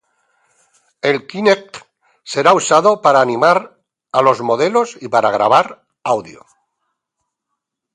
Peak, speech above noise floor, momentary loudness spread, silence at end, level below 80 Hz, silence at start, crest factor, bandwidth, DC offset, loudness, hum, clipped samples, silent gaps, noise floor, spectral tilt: 0 dBFS; 63 dB; 9 LU; 1.65 s; -64 dBFS; 1.05 s; 16 dB; 11 kHz; under 0.1%; -14 LUFS; none; under 0.1%; none; -77 dBFS; -4 dB/octave